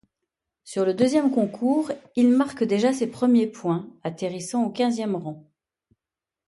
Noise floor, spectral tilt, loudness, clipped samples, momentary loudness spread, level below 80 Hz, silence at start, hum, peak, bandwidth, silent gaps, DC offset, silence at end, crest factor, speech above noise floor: -89 dBFS; -6 dB/octave; -23 LUFS; under 0.1%; 11 LU; -70 dBFS; 0.65 s; none; -8 dBFS; 11.5 kHz; none; under 0.1%; 1.1 s; 16 dB; 67 dB